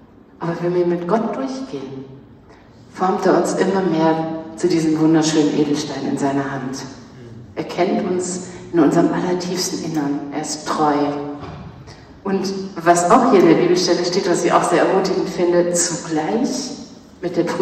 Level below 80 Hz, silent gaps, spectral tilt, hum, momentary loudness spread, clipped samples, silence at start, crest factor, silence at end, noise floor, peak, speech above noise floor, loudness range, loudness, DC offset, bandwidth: -54 dBFS; none; -5 dB/octave; none; 15 LU; under 0.1%; 0.4 s; 18 dB; 0 s; -44 dBFS; 0 dBFS; 27 dB; 7 LU; -18 LUFS; under 0.1%; 13 kHz